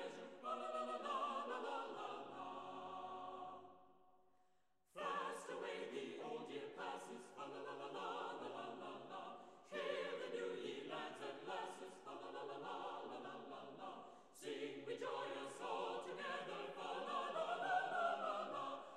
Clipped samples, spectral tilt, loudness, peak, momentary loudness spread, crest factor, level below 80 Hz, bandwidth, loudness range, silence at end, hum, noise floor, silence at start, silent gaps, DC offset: under 0.1%; -3.5 dB/octave; -48 LUFS; -28 dBFS; 10 LU; 20 dB; under -90 dBFS; 13 kHz; 7 LU; 0 s; none; -81 dBFS; 0 s; none; under 0.1%